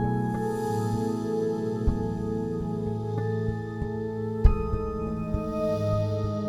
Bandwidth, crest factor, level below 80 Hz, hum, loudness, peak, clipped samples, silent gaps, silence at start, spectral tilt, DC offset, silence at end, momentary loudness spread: 13.5 kHz; 22 dB; -32 dBFS; none; -29 LUFS; -6 dBFS; under 0.1%; none; 0 s; -8.5 dB/octave; under 0.1%; 0 s; 6 LU